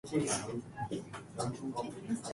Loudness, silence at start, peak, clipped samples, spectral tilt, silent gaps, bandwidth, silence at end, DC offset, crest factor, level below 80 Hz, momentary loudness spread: -38 LUFS; 0.05 s; -20 dBFS; under 0.1%; -4.5 dB/octave; none; 11.5 kHz; 0 s; under 0.1%; 18 dB; -66 dBFS; 9 LU